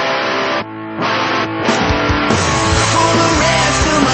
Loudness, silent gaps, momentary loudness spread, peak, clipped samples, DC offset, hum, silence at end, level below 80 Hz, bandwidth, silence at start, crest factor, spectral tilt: -14 LUFS; none; 6 LU; 0 dBFS; under 0.1%; under 0.1%; none; 0 s; -30 dBFS; 8.8 kHz; 0 s; 14 dB; -4 dB/octave